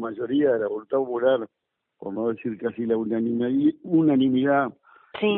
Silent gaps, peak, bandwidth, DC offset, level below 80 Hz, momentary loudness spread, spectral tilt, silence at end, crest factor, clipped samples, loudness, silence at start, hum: none; -10 dBFS; 4 kHz; under 0.1%; -66 dBFS; 10 LU; -11 dB/octave; 0 s; 14 dB; under 0.1%; -24 LUFS; 0 s; none